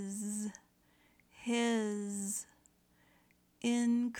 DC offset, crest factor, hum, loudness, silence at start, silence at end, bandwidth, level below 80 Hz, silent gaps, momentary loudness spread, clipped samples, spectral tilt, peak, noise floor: under 0.1%; 14 dB; none; -36 LUFS; 0 s; 0 s; 18 kHz; -80 dBFS; none; 13 LU; under 0.1%; -4 dB/octave; -22 dBFS; -70 dBFS